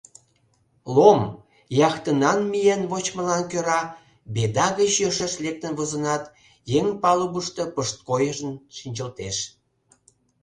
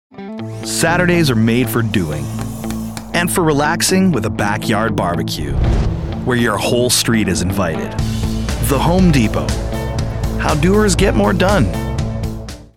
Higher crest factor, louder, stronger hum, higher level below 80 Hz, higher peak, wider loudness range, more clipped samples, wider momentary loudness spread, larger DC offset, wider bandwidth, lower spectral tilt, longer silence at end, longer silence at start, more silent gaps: first, 22 dB vs 14 dB; second, -23 LUFS vs -16 LUFS; neither; second, -58 dBFS vs -26 dBFS; about the same, 0 dBFS vs -2 dBFS; about the same, 4 LU vs 2 LU; neither; about the same, 12 LU vs 10 LU; second, under 0.1% vs 0.9%; second, 11 kHz vs 17 kHz; about the same, -4.5 dB/octave vs -5 dB/octave; first, 0.95 s vs 0.1 s; first, 0.85 s vs 0.1 s; neither